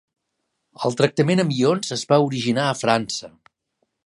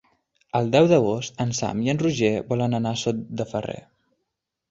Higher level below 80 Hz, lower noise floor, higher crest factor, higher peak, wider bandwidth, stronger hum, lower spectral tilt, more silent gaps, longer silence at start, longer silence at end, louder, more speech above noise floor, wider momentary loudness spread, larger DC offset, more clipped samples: second, -66 dBFS vs -56 dBFS; second, -76 dBFS vs -80 dBFS; about the same, 20 dB vs 20 dB; about the same, -2 dBFS vs -4 dBFS; first, 11.5 kHz vs 8 kHz; neither; about the same, -5 dB/octave vs -6 dB/octave; neither; first, 0.8 s vs 0.55 s; about the same, 0.8 s vs 0.9 s; about the same, -21 LUFS vs -23 LUFS; about the same, 56 dB vs 58 dB; second, 8 LU vs 11 LU; neither; neither